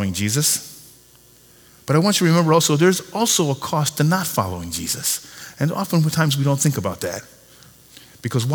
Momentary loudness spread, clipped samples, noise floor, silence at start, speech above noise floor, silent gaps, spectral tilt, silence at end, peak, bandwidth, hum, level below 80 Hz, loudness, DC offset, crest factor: 11 LU; under 0.1%; -50 dBFS; 0 s; 31 dB; none; -4.5 dB/octave; 0 s; -2 dBFS; over 20 kHz; none; -54 dBFS; -19 LUFS; under 0.1%; 18 dB